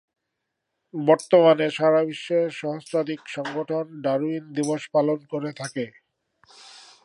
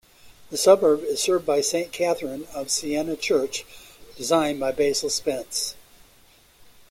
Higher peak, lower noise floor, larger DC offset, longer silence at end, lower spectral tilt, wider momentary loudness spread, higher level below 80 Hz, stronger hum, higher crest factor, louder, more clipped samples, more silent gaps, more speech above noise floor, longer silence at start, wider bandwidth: about the same, -4 dBFS vs -4 dBFS; first, -81 dBFS vs -55 dBFS; neither; second, 0.25 s vs 1.1 s; first, -5.5 dB/octave vs -2.5 dB/octave; about the same, 14 LU vs 14 LU; second, -78 dBFS vs -58 dBFS; neither; about the same, 20 dB vs 20 dB; about the same, -23 LUFS vs -23 LUFS; neither; neither; first, 58 dB vs 33 dB; first, 0.95 s vs 0.25 s; second, 11.5 kHz vs 16.5 kHz